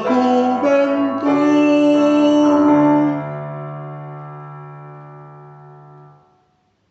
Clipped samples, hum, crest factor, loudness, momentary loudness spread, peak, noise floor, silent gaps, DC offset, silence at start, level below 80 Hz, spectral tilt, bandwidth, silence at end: under 0.1%; none; 14 dB; -15 LUFS; 21 LU; -4 dBFS; -62 dBFS; none; under 0.1%; 0 s; -72 dBFS; -7 dB/octave; 7.8 kHz; 1.45 s